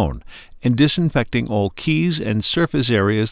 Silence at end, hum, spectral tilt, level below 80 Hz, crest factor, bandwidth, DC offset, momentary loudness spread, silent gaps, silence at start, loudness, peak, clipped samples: 0 s; none; -11 dB/octave; -38 dBFS; 16 dB; 4 kHz; under 0.1%; 6 LU; none; 0 s; -19 LUFS; -4 dBFS; under 0.1%